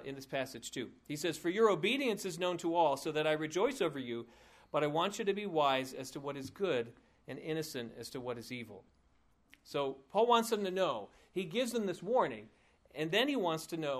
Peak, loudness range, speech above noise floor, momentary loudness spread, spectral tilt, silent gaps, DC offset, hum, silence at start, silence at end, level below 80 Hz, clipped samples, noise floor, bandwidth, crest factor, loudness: -14 dBFS; 8 LU; 36 dB; 13 LU; -4.5 dB/octave; none; under 0.1%; none; 0 s; 0 s; -74 dBFS; under 0.1%; -71 dBFS; 15.5 kHz; 22 dB; -35 LUFS